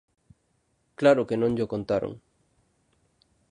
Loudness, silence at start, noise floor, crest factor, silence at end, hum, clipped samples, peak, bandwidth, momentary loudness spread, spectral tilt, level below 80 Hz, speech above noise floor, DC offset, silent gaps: -25 LUFS; 1 s; -71 dBFS; 22 dB; 1.35 s; none; under 0.1%; -6 dBFS; 10 kHz; 13 LU; -7 dB/octave; -60 dBFS; 47 dB; under 0.1%; none